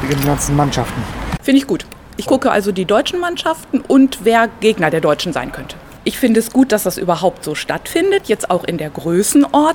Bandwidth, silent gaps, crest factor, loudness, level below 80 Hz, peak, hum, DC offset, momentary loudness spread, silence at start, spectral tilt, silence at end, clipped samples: 18.5 kHz; none; 16 dB; -15 LUFS; -36 dBFS; 0 dBFS; none; under 0.1%; 10 LU; 0 s; -5 dB/octave; 0 s; under 0.1%